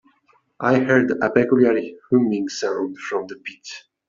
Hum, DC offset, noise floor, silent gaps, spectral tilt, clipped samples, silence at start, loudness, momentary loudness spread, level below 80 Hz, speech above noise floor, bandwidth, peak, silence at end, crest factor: none; under 0.1%; -61 dBFS; none; -6 dB/octave; under 0.1%; 0.6 s; -20 LUFS; 17 LU; -62 dBFS; 41 dB; 7.6 kHz; -2 dBFS; 0.3 s; 18 dB